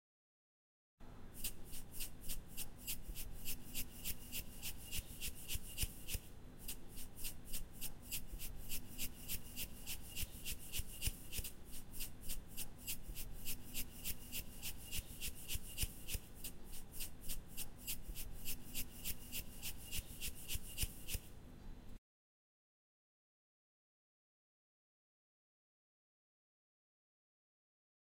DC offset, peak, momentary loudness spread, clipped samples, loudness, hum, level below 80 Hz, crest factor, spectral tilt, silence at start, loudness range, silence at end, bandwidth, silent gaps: under 0.1%; -26 dBFS; 7 LU; under 0.1%; -47 LUFS; none; -52 dBFS; 20 dB; -2 dB/octave; 1 s; 3 LU; 6.2 s; 16.5 kHz; none